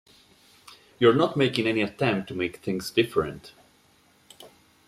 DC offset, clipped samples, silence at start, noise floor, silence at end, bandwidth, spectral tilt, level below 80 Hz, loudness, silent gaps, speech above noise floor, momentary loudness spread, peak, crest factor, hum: under 0.1%; under 0.1%; 0.7 s; -61 dBFS; 0.4 s; 15.5 kHz; -6 dB/octave; -60 dBFS; -25 LUFS; none; 36 dB; 10 LU; -6 dBFS; 22 dB; none